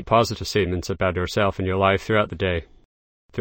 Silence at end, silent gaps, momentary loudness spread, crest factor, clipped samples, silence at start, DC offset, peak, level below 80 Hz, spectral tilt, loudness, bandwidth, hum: 0 s; 2.85-3.29 s; 5 LU; 18 dB; under 0.1%; 0 s; under 0.1%; -4 dBFS; -42 dBFS; -5.5 dB/octave; -22 LUFS; 16.5 kHz; none